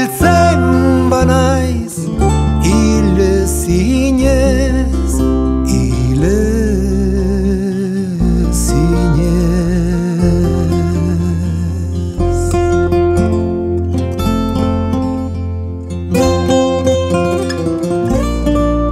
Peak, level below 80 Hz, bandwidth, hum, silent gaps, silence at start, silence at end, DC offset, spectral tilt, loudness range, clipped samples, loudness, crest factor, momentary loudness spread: 0 dBFS; -20 dBFS; 15.5 kHz; none; none; 0 s; 0 s; under 0.1%; -6.5 dB/octave; 3 LU; under 0.1%; -14 LUFS; 12 dB; 6 LU